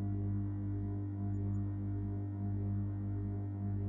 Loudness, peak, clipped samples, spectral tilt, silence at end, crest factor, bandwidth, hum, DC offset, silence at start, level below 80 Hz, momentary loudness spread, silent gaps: -39 LUFS; -28 dBFS; under 0.1%; -13 dB/octave; 0 s; 8 dB; 2.2 kHz; 50 Hz at -40 dBFS; under 0.1%; 0 s; -52 dBFS; 2 LU; none